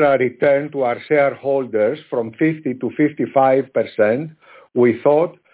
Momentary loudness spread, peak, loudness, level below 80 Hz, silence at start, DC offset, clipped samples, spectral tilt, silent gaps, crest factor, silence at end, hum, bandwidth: 9 LU; -2 dBFS; -18 LUFS; -66 dBFS; 0 s; under 0.1%; under 0.1%; -11 dB/octave; none; 14 dB; 0.25 s; none; 4 kHz